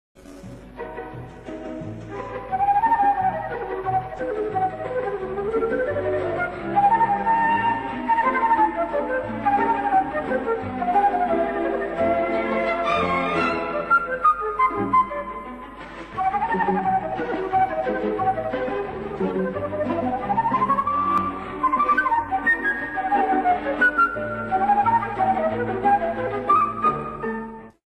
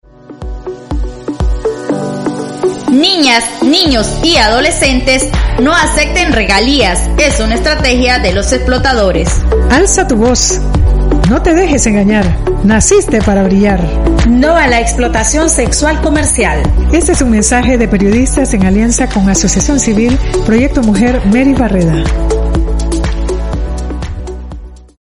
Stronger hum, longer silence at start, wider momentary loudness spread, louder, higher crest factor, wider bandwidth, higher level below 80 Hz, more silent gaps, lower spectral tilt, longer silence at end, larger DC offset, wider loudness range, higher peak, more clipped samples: neither; second, 0.15 s vs 0.3 s; first, 14 LU vs 9 LU; second, -22 LUFS vs -10 LUFS; about the same, 14 dB vs 10 dB; about the same, 11.5 kHz vs 12 kHz; second, -48 dBFS vs -16 dBFS; neither; first, -7 dB/octave vs -4 dB/octave; about the same, 0.3 s vs 0.25 s; neither; about the same, 4 LU vs 3 LU; second, -8 dBFS vs 0 dBFS; neither